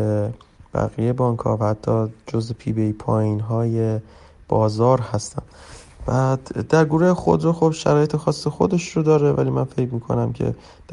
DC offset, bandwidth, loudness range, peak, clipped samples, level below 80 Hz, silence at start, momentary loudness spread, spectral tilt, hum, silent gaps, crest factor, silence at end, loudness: under 0.1%; 11.5 kHz; 4 LU; -2 dBFS; under 0.1%; -46 dBFS; 0 s; 9 LU; -7.5 dB/octave; none; none; 18 dB; 0 s; -21 LUFS